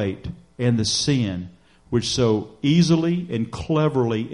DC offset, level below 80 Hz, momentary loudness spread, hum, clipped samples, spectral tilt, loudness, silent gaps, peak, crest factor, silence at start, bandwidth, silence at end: under 0.1%; -48 dBFS; 10 LU; none; under 0.1%; -5.5 dB/octave; -21 LUFS; none; -6 dBFS; 14 dB; 0 s; 11.5 kHz; 0 s